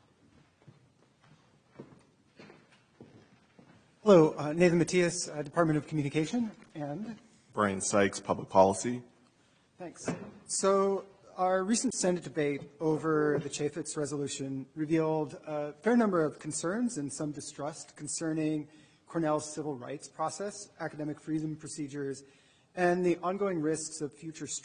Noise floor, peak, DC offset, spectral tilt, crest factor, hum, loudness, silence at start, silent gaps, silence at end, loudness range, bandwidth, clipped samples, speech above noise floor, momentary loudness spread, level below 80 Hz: -67 dBFS; -8 dBFS; under 0.1%; -5 dB/octave; 24 dB; none; -31 LUFS; 1.8 s; none; 0.05 s; 7 LU; 10.5 kHz; under 0.1%; 36 dB; 14 LU; -68 dBFS